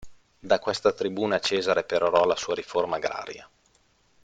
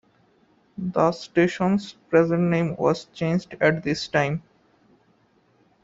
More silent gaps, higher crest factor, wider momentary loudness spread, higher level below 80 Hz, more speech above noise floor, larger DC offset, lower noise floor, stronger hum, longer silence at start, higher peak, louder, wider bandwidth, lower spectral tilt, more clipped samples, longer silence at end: neither; about the same, 20 dB vs 20 dB; first, 9 LU vs 6 LU; about the same, -62 dBFS vs -60 dBFS; about the same, 39 dB vs 40 dB; neither; about the same, -64 dBFS vs -62 dBFS; neither; second, 0 s vs 0.8 s; about the same, -6 dBFS vs -4 dBFS; about the same, -25 LUFS vs -23 LUFS; first, 9.4 kHz vs 7.8 kHz; second, -3.5 dB/octave vs -6.5 dB/octave; neither; second, 0.8 s vs 1.45 s